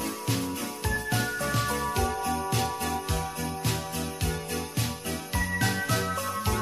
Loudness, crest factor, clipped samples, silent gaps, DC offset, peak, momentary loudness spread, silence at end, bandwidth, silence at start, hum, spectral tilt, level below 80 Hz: -29 LUFS; 18 dB; under 0.1%; none; under 0.1%; -12 dBFS; 5 LU; 0 s; 15.5 kHz; 0 s; none; -4 dB/octave; -40 dBFS